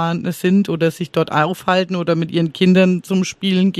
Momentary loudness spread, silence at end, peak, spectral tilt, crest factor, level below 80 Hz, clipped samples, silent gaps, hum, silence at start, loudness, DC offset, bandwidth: 6 LU; 0 s; -2 dBFS; -6.5 dB/octave; 14 dB; -58 dBFS; under 0.1%; none; none; 0 s; -17 LUFS; under 0.1%; 14 kHz